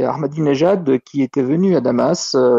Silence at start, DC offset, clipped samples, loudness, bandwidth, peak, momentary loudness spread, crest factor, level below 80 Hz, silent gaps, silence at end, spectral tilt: 0 s; under 0.1%; under 0.1%; -16 LUFS; 8 kHz; -4 dBFS; 4 LU; 12 dB; -58 dBFS; none; 0 s; -6 dB/octave